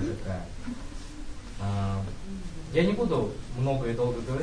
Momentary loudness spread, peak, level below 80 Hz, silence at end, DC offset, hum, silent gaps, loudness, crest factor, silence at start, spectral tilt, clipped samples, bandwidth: 17 LU; -10 dBFS; -40 dBFS; 0 s; 0.3%; none; none; -31 LUFS; 18 dB; 0 s; -7 dB/octave; under 0.1%; 10.5 kHz